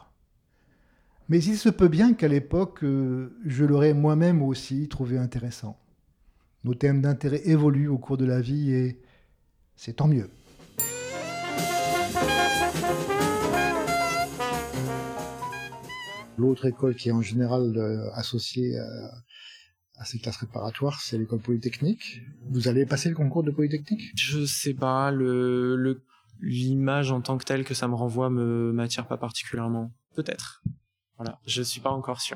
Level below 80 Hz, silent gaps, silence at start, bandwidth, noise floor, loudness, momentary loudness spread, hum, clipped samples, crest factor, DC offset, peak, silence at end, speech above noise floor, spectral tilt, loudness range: -52 dBFS; none; 1.3 s; 19 kHz; -65 dBFS; -26 LUFS; 15 LU; none; under 0.1%; 20 dB; under 0.1%; -8 dBFS; 0 s; 40 dB; -6 dB/octave; 7 LU